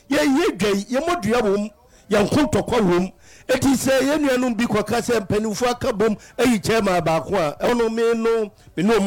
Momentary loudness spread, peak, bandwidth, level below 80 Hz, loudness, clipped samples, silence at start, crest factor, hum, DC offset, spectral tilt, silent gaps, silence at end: 5 LU; -8 dBFS; 17.5 kHz; -44 dBFS; -20 LUFS; under 0.1%; 0.1 s; 10 dB; none; under 0.1%; -5 dB/octave; none; 0 s